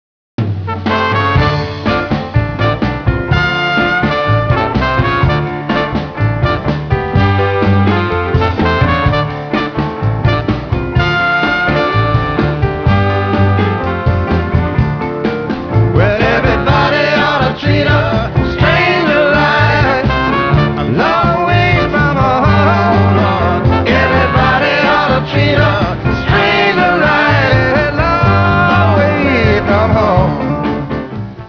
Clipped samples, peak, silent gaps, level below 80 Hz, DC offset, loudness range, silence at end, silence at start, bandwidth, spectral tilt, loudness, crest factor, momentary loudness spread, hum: under 0.1%; 0 dBFS; none; -26 dBFS; under 0.1%; 3 LU; 0 s; 0.4 s; 5.4 kHz; -7.5 dB/octave; -12 LUFS; 10 dB; 6 LU; none